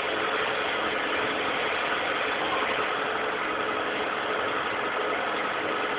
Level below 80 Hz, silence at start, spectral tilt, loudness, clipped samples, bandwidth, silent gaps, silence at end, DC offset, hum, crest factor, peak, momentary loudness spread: -60 dBFS; 0 s; 0 dB/octave; -27 LUFS; under 0.1%; 4 kHz; none; 0 s; under 0.1%; none; 14 dB; -14 dBFS; 2 LU